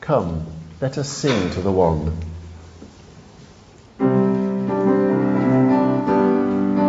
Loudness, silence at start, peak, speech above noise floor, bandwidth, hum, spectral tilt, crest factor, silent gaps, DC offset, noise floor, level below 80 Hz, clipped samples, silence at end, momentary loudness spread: -19 LUFS; 0 s; -4 dBFS; 25 dB; 8 kHz; none; -7 dB/octave; 16 dB; none; under 0.1%; -46 dBFS; -42 dBFS; under 0.1%; 0 s; 12 LU